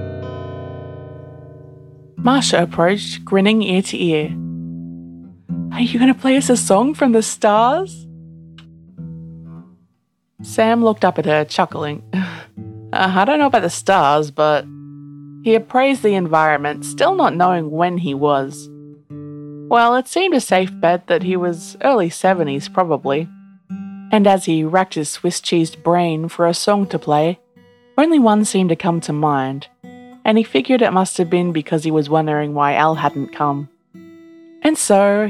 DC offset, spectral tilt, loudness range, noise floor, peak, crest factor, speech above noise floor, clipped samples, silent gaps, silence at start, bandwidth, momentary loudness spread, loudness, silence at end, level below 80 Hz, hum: under 0.1%; -5 dB/octave; 3 LU; -67 dBFS; 0 dBFS; 16 dB; 51 dB; under 0.1%; none; 0 s; 13.5 kHz; 19 LU; -16 LUFS; 0 s; -58 dBFS; none